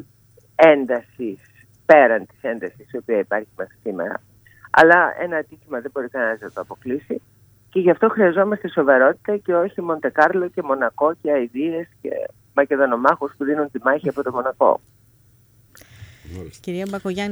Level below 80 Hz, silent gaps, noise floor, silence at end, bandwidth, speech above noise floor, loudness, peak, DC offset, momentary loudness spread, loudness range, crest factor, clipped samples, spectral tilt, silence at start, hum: -60 dBFS; none; -55 dBFS; 0 s; over 20 kHz; 36 dB; -19 LUFS; 0 dBFS; under 0.1%; 17 LU; 5 LU; 20 dB; under 0.1%; -6.5 dB/octave; 0.6 s; none